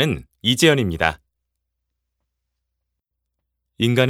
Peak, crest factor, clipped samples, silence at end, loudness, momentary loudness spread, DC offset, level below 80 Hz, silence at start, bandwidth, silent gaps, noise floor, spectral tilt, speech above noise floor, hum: 0 dBFS; 22 dB; under 0.1%; 0 s; -19 LUFS; 8 LU; under 0.1%; -46 dBFS; 0 s; 16.5 kHz; none; -79 dBFS; -4.5 dB/octave; 61 dB; none